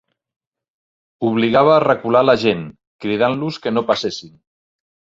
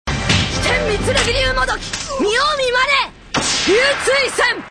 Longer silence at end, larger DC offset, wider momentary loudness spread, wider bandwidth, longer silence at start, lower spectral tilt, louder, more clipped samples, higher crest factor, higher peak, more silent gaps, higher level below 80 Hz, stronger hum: first, 0.85 s vs 0 s; neither; first, 13 LU vs 6 LU; second, 7.8 kHz vs 11 kHz; first, 1.2 s vs 0.05 s; first, -6 dB/octave vs -3 dB/octave; about the same, -17 LUFS vs -16 LUFS; neither; about the same, 18 dB vs 14 dB; about the same, -2 dBFS vs -2 dBFS; first, 2.87-2.99 s vs none; second, -56 dBFS vs -30 dBFS; neither